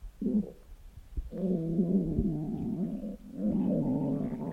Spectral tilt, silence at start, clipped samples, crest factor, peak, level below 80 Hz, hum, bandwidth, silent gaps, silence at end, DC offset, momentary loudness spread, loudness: -11 dB/octave; 0 s; under 0.1%; 14 dB; -16 dBFS; -46 dBFS; none; 4.1 kHz; none; 0 s; under 0.1%; 13 LU; -32 LUFS